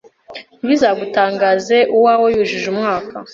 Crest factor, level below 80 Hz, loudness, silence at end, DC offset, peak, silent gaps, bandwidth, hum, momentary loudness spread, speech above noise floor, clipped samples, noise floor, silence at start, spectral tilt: 14 dB; -54 dBFS; -15 LUFS; 0 s; under 0.1%; -2 dBFS; none; 7.6 kHz; none; 14 LU; 22 dB; under 0.1%; -37 dBFS; 0.3 s; -4.5 dB/octave